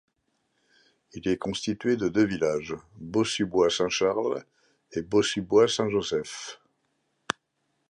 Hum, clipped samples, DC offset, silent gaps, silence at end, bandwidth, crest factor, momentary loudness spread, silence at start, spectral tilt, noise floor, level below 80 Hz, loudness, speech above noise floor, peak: none; under 0.1%; under 0.1%; none; 1.35 s; 11 kHz; 22 dB; 13 LU; 1.15 s; -4.5 dB/octave; -76 dBFS; -60 dBFS; -27 LUFS; 50 dB; -6 dBFS